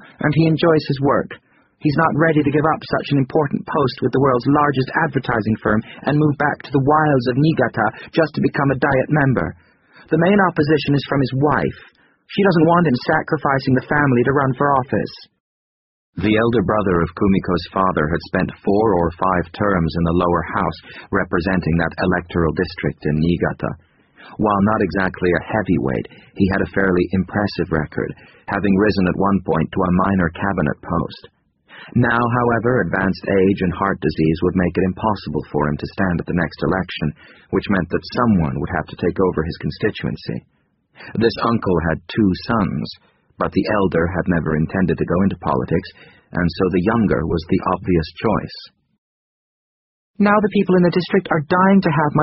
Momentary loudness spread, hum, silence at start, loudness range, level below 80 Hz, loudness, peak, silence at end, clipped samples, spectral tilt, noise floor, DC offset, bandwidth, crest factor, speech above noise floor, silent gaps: 8 LU; none; 0.2 s; 3 LU; -40 dBFS; -18 LUFS; -2 dBFS; 0 s; under 0.1%; -6 dB/octave; under -90 dBFS; under 0.1%; 5.8 kHz; 16 dB; over 72 dB; 15.40-16.13 s, 48.98-50.14 s